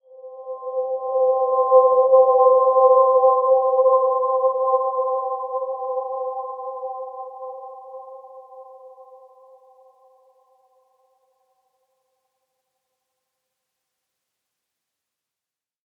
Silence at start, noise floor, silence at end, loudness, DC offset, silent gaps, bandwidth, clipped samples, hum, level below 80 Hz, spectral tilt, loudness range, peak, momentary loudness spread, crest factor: 0.2 s; -90 dBFS; 7 s; -18 LUFS; under 0.1%; none; 1.2 kHz; under 0.1%; none; -84 dBFS; -8 dB/octave; 21 LU; -2 dBFS; 21 LU; 18 dB